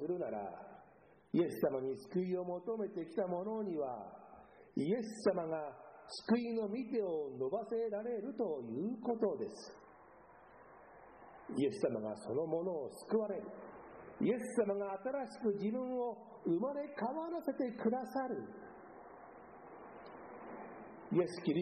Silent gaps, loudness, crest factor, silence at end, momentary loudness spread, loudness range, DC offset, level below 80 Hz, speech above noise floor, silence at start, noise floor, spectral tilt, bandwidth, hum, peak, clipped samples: none; -39 LUFS; 18 dB; 0 s; 19 LU; 4 LU; under 0.1%; -78 dBFS; 27 dB; 0 s; -65 dBFS; -7 dB/octave; 9.4 kHz; none; -20 dBFS; under 0.1%